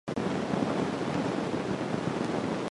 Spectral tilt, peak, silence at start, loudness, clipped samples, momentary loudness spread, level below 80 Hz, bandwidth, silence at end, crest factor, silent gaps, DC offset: -6.5 dB/octave; -16 dBFS; 0.05 s; -31 LUFS; under 0.1%; 2 LU; -58 dBFS; 11.5 kHz; 0.05 s; 14 dB; none; under 0.1%